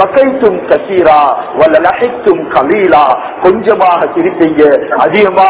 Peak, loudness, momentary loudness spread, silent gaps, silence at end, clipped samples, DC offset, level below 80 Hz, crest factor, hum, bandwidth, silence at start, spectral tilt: 0 dBFS; -8 LUFS; 4 LU; none; 0 s; 6%; under 0.1%; -44 dBFS; 8 dB; none; 4 kHz; 0 s; -9.5 dB/octave